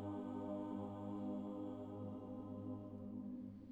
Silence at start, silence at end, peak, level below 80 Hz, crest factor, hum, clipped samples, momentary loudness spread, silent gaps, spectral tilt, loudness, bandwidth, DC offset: 0 s; 0 s; -34 dBFS; -74 dBFS; 12 dB; none; under 0.1%; 5 LU; none; -10 dB/octave; -48 LUFS; 8 kHz; under 0.1%